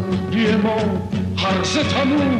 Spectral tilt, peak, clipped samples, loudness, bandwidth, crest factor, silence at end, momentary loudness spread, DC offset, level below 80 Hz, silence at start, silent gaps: -5.5 dB/octave; -6 dBFS; under 0.1%; -19 LUFS; 10.5 kHz; 12 dB; 0 s; 4 LU; under 0.1%; -44 dBFS; 0 s; none